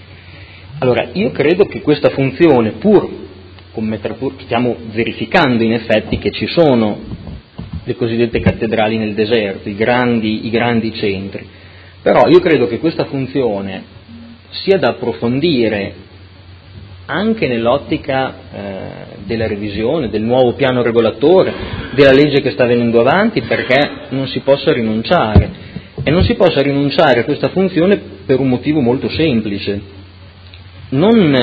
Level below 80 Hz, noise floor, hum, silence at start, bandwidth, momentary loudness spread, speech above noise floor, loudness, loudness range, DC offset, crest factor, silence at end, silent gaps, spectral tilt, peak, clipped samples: -34 dBFS; -38 dBFS; none; 0.1 s; 7.8 kHz; 14 LU; 24 dB; -14 LUFS; 5 LU; under 0.1%; 14 dB; 0 s; none; -8.5 dB/octave; 0 dBFS; 0.1%